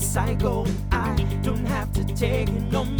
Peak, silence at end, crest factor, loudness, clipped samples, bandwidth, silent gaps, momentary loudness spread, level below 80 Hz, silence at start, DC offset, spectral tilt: -8 dBFS; 0 s; 16 dB; -25 LUFS; under 0.1%; over 20 kHz; none; 2 LU; -28 dBFS; 0 s; under 0.1%; -6 dB/octave